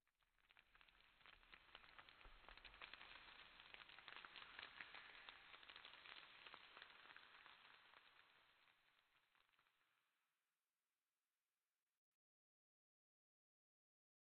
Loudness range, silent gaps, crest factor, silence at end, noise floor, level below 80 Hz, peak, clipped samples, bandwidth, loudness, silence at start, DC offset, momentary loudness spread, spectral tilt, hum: 6 LU; none; 30 dB; 4.15 s; under -90 dBFS; -84 dBFS; -38 dBFS; under 0.1%; 4.5 kHz; -62 LUFS; 0.05 s; under 0.1%; 9 LU; 1.5 dB/octave; none